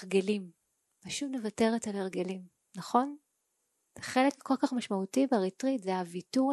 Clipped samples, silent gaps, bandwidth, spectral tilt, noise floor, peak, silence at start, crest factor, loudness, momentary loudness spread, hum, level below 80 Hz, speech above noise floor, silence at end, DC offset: under 0.1%; none; 12.5 kHz; -5 dB/octave; -79 dBFS; -12 dBFS; 0 s; 20 dB; -32 LUFS; 15 LU; none; -74 dBFS; 49 dB; 0 s; under 0.1%